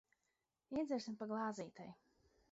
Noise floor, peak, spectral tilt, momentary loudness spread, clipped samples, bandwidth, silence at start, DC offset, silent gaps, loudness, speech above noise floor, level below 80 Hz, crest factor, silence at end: -88 dBFS; -30 dBFS; -5 dB/octave; 14 LU; under 0.1%; 7.6 kHz; 0.7 s; under 0.1%; none; -45 LUFS; 44 dB; -80 dBFS; 16 dB; 0.6 s